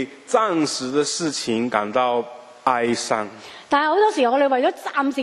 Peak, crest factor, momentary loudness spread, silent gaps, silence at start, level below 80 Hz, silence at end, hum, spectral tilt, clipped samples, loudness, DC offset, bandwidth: -2 dBFS; 20 dB; 8 LU; none; 0 s; -66 dBFS; 0 s; none; -3.5 dB/octave; under 0.1%; -21 LUFS; under 0.1%; 12.5 kHz